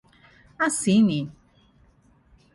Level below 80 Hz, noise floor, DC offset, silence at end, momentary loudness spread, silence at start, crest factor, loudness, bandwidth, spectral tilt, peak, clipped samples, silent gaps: -60 dBFS; -59 dBFS; under 0.1%; 1.25 s; 12 LU; 0.6 s; 16 dB; -22 LUFS; 11.5 kHz; -5 dB/octave; -10 dBFS; under 0.1%; none